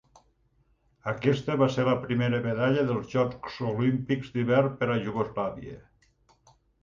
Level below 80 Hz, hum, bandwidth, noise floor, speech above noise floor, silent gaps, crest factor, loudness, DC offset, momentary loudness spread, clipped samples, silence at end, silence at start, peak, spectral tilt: -58 dBFS; none; 7.2 kHz; -68 dBFS; 41 dB; none; 18 dB; -27 LUFS; under 0.1%; 9 LU; under 0.1%; 1 s; 1.05 s; -10 dBFS; -7.5 dB/octave